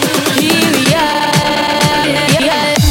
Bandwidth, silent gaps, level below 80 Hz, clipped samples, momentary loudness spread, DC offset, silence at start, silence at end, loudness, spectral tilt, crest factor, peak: 17 kHz; none; -38 dBFS; under 0.1%; 2 LU; under 0.1%; 0 s; 0 s; -11 LUFS; -4 dB/octave; 12 dB; 0 dBFS